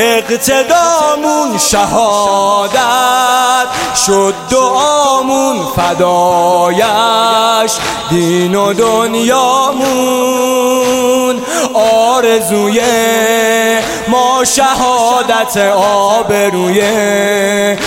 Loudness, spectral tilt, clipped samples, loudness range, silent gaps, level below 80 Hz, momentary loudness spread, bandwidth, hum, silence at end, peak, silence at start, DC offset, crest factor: -10 LUFS; -3 dB/octave; under 0.1%; 1 LU; none; -42 dBFS; 3 LU; 17 kHz; none; 0 s; 0 dBFS; 0 s; under 0.1%; 10 dB